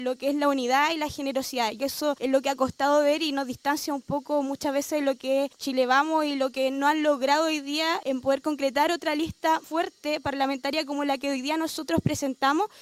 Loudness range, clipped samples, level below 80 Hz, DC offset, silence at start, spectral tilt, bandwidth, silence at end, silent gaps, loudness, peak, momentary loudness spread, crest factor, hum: 2 LU; under 0.1%; -60 dBFS; under 0.1%; 0 s; -4 dB/octave; 16 kHz; 0 s; none; -26 LUFS; -10 dBFS; 6 LU; 16 dB; none